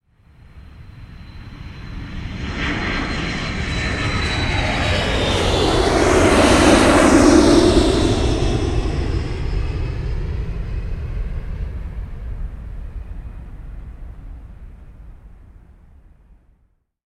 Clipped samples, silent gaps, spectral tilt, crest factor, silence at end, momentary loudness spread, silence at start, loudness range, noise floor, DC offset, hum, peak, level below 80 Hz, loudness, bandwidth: under 0.1%; none; -5 dB/octave; 18 dB; 1.65 s; 25 LU; 0.55 s; 20 LU; -62 dBFS; under 0.1%; none; 0 dBFS; -26 dBFS; -17 LUFS; 13 kHz